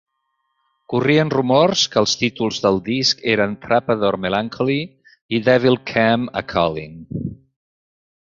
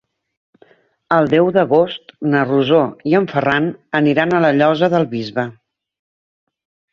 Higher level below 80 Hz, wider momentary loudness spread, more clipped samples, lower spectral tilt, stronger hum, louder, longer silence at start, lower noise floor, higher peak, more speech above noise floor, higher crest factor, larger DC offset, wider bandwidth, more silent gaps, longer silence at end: first, -50 dBFS vs -58 dBFS; first, 11 LU vs 8 LU; neither; second, -4.5 dB/octave vs -8 dB/octave; neither; about the same, -18 LUFS vs -16 LUFS; second, 0.9 s vs 1.1 s; first, -72 dBFS vs -52 dBFS; about the same, -2 dBFS vs 0 dBFS; first, 54 dB vs 37 dB; about the same, 18 dB vs 16 dB; neither; about the same, 7.6 kHz vs 7.2 kHz; first, 5.22-5.29 s vs none; second, 0.95 s vs 1.4 s